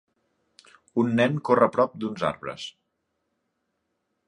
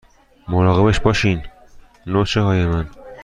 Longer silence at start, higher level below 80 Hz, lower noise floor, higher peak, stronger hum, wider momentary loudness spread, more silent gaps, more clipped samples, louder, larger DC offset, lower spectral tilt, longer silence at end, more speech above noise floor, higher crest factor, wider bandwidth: first, 0.95 s vs 0.45 s; second, -66 dBFS vs -34 dBFS; first, -77 dBFS vs -44 dBFS; about the same, -4 dBFS vs -2 dBFS; neither; first, 15 LU vs 11 LU; neither; neither; second, -24 LUFS vs -18 LUFS; neither; about the same, -6.5 dB/octave vs -6.5 dB/octave; first, 1.55 s vs 0 s; first, 54 dB vs 28 dB; first, 24 dB vs 16 dB; about the same, 10.5 kHz vs 9.8 kHz